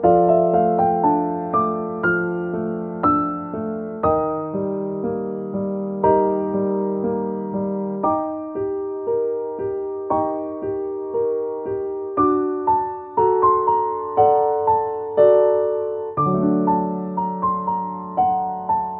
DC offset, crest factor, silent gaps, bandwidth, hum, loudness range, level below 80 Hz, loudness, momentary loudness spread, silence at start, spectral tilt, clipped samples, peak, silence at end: under 0.1%; 16 dB; none; 3.8 kHz; none; 6 LU; -52 dBFS; -21 LUFS; 9 LU; 0 s; -12.5 dB/octave; under 0.1%; -4 dBFS; 0 s